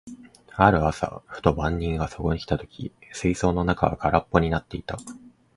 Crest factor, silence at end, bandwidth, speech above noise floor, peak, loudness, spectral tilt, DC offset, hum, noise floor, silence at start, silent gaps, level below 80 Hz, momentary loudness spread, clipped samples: 24 dB; 0.25 s; 11.5 kHz; 20 dB; 0 dBFS; -24 LUFS; -6.5 dB/octave; under 0.1%; none; -44 dBFS; 0.05 s; none; -38 dBFS; 17 LU; under 0.1%